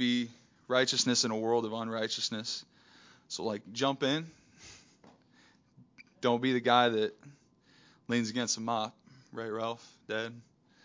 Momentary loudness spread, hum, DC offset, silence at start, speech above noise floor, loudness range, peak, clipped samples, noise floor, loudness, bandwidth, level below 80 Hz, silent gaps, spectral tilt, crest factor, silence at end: 16 LU; none; under 0.1%; 0 s; 33 dB; 6 LU; -10 dBFS; under 0.1%; -64 dBFS; -32 LUFS; 7.6 kHz; -78 dBFS; none; -3.5 dB/octave; 24 dB; 0.45 s